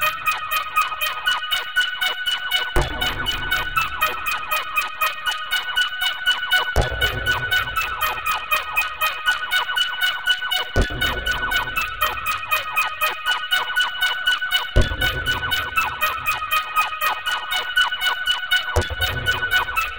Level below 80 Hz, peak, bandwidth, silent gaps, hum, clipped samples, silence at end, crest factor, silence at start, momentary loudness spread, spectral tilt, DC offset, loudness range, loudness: -34 dBFS; -4 dBFS; 17.5 kHz; none; none; under 0.1%; 0 s; 18 dB; 0 s; 4 LU; -2 dB/octave; 0.6%; 1 LU; -20 LUFS